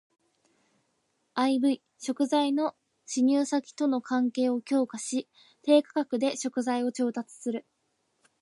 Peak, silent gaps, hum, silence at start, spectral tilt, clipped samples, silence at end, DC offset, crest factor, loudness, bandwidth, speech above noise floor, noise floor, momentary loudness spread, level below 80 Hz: -10 dBFS; none; none; 1.35 s; -3.5 dB/octave; under 0.1%; 0.8 s; under 0.1%; 20 dB; -28 LUFS; 11.5 kHz; 48 dB; -75 dBFS; 11 LU; -84 dBFS